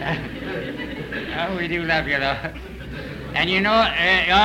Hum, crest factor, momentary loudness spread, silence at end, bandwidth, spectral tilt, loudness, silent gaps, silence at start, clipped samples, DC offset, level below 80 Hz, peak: none; 16 dB; 16 LU; 0 s; 16 kHz; -5 dB/octave; -21 LUFS; none; 0 s; under 0.1%; under 0.1%; -40 dBFS; -6 dBFS